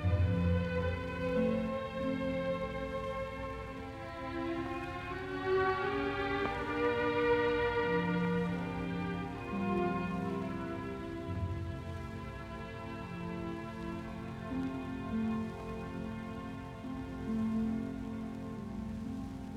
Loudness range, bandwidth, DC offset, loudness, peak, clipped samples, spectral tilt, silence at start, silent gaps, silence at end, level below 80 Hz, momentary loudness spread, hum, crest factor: 8 LU; 12 kHz; under 0.1%; -36 LUFS; -20 dBFS; under 0.1%; -7.5 dB/octave; 0 s; none; 0 s; -50 dBFS; 11 LU; none; 16 dB